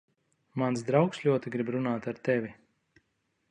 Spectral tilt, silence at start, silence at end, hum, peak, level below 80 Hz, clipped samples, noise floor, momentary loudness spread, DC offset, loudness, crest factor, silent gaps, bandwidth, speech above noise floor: -7 dB/octave; 0.55 s; 0.95 s; none; -10 dBFS; -72 dBFS; under 0.1%; -77 dBFS; 6 LU; under 0.1%; -29 LUFS; 22 dB; none; 10.5 kHz; 48 dB